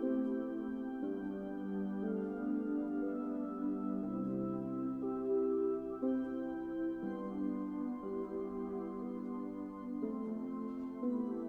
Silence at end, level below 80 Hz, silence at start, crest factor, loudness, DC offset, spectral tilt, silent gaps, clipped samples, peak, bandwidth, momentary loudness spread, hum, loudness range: 0 s; -68 dBFS; 0 s; 14 dB; -39 LUFS; under 0.1%; -10 dB/octave; none; under 0.1%; -24 dBFS; 4.1 kHz; 6 LU; none; 4 LU